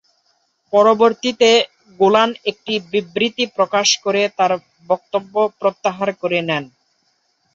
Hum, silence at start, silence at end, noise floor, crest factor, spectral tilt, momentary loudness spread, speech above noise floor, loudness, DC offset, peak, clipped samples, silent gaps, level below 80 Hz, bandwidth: none; 0.7 s; 0.9 s; -64 dBFS; 18 dB; -3 dB/octave; 9 LU; 48 dB; -17 LUFS; under 0.1%; 0 dBFS; under 0.1%; none; -64 dBFS; 7.8 kHz